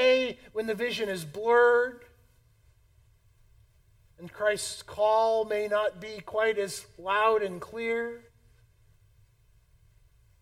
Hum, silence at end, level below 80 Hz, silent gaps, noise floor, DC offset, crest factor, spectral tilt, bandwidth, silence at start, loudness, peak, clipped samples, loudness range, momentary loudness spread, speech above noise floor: none; 2.2 s; -64 dBFS; none; -62 dBFS; under 0.1%; 18 dB; -3 dB/octave; 16 kHz; 0 s; -28 LUFS; -12 dBFS; under 0.1%; 5 LU; 12 LU; 35 dB